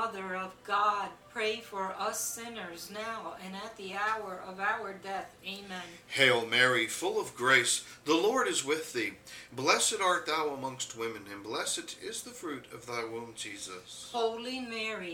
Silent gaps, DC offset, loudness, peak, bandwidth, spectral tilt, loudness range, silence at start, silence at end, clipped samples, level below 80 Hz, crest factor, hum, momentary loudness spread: none; under 0.1%; -32 LUFS; -10 dBFS; 18 kHz; -2 dB/octave; 10 LU; 0 s; 0 s; under 0.1%; -72 dBFS; 24 dB; none; 16 LU